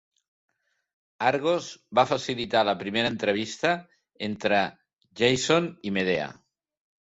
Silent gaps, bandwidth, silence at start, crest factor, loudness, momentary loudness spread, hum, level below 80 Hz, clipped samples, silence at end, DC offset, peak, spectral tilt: 4.93-4.97 s; 8 kHz; 1.2 s; 22 dB; -26 LUFS; 6 LU; none; -64 dBFS; under 0.1%; 0.7 s; under 0.1%; -6 dBFS; -4 dB/octave